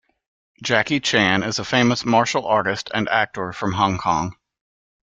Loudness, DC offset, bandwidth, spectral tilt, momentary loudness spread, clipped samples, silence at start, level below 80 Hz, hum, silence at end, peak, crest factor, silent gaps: -20 LUFS; under 0.1%; 9.2 kHz; -4 dB/octave; 8 LU; under 0.1%; 0.6 s; -54 dBFS; none; 0.8 s; -2 dBFS; 18 dB; none